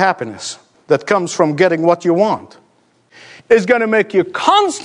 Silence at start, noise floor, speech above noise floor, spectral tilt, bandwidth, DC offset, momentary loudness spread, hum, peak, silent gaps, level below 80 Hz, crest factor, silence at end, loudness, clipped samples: 0 s; -55 dBFS; 41 dB; -4.5 dB/octave; 11 kHz; under 0.1%; 12 LU; none; 0 dBFS; none; -62 dBFS; 16 dB; 0 s; -14 LUFS; under 0.1%